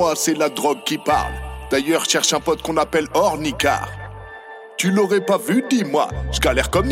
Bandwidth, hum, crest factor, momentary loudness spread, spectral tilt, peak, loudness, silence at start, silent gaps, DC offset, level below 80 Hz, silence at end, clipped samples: 16.5 kHz; none; 18 dB; 14 LU; -3.5 dB/octave; -2 dBFS; -19 LUFS; 0 s; none; under 0.1%; -34 dBFS; 0 s; under 0.1%